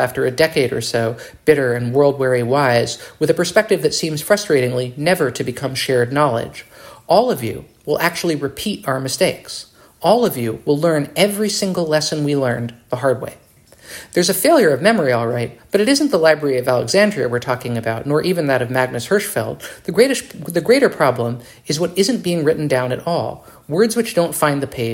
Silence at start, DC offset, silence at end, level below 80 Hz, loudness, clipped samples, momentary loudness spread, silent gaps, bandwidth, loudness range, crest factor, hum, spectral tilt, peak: 0 s; under 0.1%; 0 s; -54 dBFS; -17 LUFS; under 0.1%; 9 LU; none; 16.5 kHz; 3 LU; 18 dB; none; -4.5 dB/octave; 0 dBFS